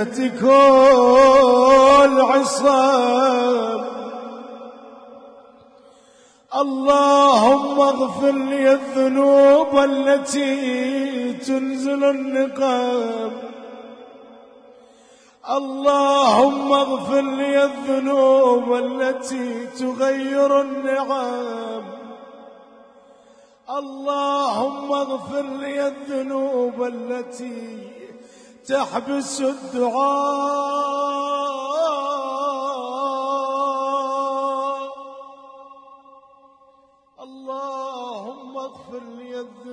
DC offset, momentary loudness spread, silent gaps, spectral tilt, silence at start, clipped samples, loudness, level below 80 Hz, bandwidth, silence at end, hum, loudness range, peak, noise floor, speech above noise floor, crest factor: under 0.1%; 21 LU; none; -3.5 dB/octave; 0 s; under 0.1%; -18 LUFS; -58 dBFS; 10.5 kHz; 0 s; none; 13 LU; -4 dBFS; -55 dBFS; 38 dB; 16 dB